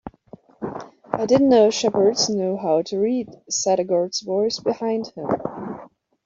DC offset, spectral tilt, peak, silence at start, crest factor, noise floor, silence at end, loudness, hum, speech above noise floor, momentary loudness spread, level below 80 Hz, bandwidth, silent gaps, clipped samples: under 0.1%; -4 dB/octave; -4 dBFS; 0.05 s; 18 dB; -47 dBFS; 0.4 s; -21 LUFS; none; 27 dB; 17 LU; -60 dBFS; 7.8 kHz; none; under 0.1%